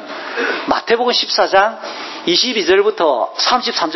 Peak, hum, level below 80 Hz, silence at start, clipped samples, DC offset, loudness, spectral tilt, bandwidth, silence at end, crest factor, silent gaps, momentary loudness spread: 0 dBFS; none; -56 dBFS; 0 s; under 0.1%; under 0.1%; -15 LUFS; -2 dB/octave; 6.2 kHz; 0 s; 16 dB; none; 8 LU